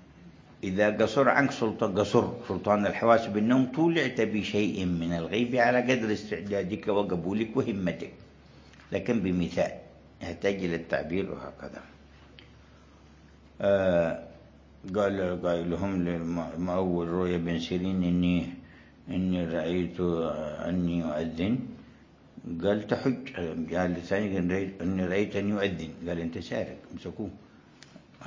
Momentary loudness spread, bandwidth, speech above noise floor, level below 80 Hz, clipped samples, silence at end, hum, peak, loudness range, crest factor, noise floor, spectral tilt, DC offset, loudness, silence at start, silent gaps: 14 LU; 7.6 kHz; 27 dB; -52 dBFS; under 0.1%; 0 s; none; -6 dBFS; 6 LU; 22 dB; -54 dBFS; -7 dB/octave; under 0.1%; -29 LUFS; 0.1 s; none